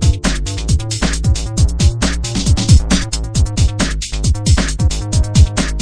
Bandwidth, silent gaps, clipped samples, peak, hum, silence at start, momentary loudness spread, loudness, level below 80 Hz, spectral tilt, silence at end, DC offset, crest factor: 10.5 kHz; none; under 0.1%; 0 dBFS; none; 0 s; 6 LU; -15 LUFS; -16 dBFS; -4.5 dB/octave; 0 s; under 0.1%; 14 dB